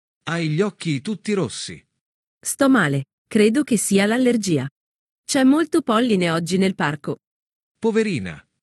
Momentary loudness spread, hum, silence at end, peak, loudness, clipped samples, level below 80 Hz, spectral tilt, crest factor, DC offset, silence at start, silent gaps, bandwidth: 13 LU; none; 0.25 s; -4 dBFS; -20 LUFS; under 0.1%; -64 dBFS; -5 dB/octave; 16 dB; under 0.1%; 0.25 s; 2.01-2.41 s, 3.13-3.25 s, 4.71-5.24 s, 7.27-7.75 s; 12.5 kHz